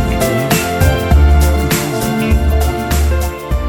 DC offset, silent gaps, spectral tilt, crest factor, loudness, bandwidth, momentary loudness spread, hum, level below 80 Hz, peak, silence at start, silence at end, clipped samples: under 0.1%; none; -5.5 dB/octave; 12 dB; -14 LUFS; 18.5 kHz; 5 LU; none; -14 dBFS; 0 dBFS; 0 s; 0 s; under 0.1%